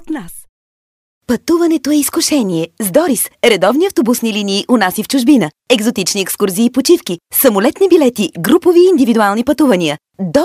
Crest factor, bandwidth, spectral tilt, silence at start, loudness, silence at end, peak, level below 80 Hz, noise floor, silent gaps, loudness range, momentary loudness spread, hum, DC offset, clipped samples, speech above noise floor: 12 dB; 16 kHz; -4 dB/octave; 0 s; -12 LUFS; 0 s; 0 dBFS; -50 dBFS; under -90 dBFS; 0.49-1.21 s; 3 LU; 6 LU; none; under 0.1%; under 0.1%; over 78 dB